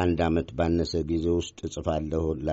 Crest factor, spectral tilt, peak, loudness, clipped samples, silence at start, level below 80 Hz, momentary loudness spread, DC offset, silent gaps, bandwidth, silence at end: 14 dB; -6.5 dB/octave; -12 dBFS; -27 LUFS; under 0.1%; 0 s; -40 dBFS; 4 LU; under 0.1%; none; 8 kHz; 0 s